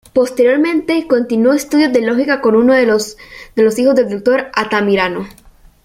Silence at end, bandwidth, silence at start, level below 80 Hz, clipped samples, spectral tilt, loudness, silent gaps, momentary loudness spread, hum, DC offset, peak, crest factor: 0.55 s; 16 kHz; 0.15 s; -48 dBFS; under 0.1%; -5 dB/octave; -13 LUFS; none; 8 LU; none; under 0.1%; 0 dBFS; 12 dB